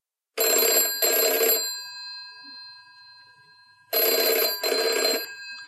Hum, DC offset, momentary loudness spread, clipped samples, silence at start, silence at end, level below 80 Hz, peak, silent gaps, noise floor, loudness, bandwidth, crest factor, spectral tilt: none; under 0.1%; 19 LU; under 0.1%; 0.35 s; 0 s; -86 dBFS; -8 dBFS; none; -55 dBFS; -21 LUFS; 16 kHz; 18 dB; 2 dB/octave